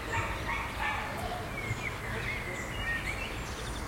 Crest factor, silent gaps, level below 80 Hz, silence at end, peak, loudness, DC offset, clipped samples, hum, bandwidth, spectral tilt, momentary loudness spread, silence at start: 16 dB; none; -44 dBFS; 0 s; -20 dBFS; -34 LUFS; under 0.1%; under 0.1%; none; 16.5 kHz; -4 dB/octave; 4 LU; 0 s